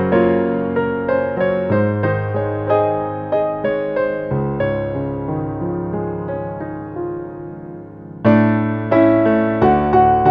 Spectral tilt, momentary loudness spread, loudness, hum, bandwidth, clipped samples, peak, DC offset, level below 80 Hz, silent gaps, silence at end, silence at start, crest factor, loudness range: -10.5 dB/octave; 13 LU; -18 LUFS; none; 5.2 kHz; under 0.1%; -2 dBFS; under 0.1%; -42 dBFS; none; 0 s; 0 s; 16 dB; 7 LU